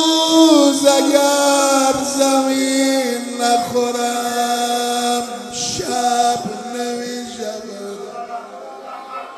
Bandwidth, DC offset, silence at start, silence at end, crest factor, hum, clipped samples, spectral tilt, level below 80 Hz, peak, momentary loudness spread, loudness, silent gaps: 14 kHz; under 0.1%; 0 s; 0 s; 16 dB; none; under 0.1%; -2 dB/octave; -60 dBFS; 0 dBFS; 18 LU; -16 LUFS; none